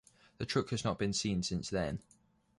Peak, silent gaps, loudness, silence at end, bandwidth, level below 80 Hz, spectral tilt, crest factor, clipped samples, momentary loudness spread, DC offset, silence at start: -18 dBFS; none; -36 LUFS; 0.6 s; 11.5 kHz; -56 dBFS; -4.5 dB/octave; 18 dB; under 0.1%; 7 LU; under 0.1%; 0.4 s